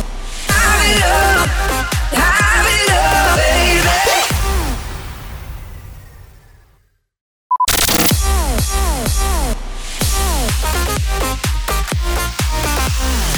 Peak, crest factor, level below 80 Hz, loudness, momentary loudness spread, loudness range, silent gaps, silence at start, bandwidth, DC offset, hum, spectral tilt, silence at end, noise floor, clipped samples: -2 dBFS; 14 dB; -20 dBFS; -14 LUFS; 15 LU; 7 LU; 7.21-7.50 s; 0 s; over 20 kHz; under 0.1%; none; -3 dB/octave; 0 s; -56 dBFS; under 0.1%